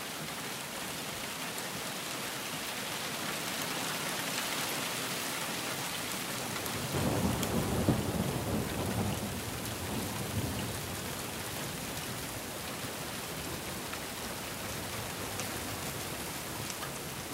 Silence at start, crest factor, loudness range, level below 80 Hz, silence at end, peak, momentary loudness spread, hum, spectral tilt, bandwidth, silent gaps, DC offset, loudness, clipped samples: 0 s; 22 dB; 5 LU; -54 dBFS; 0 s; -14 dBFS; 6 LU; none; -3.5 dB/octave; 16 kHz; none; under 0.1%; -35 LUFS; under 0.1%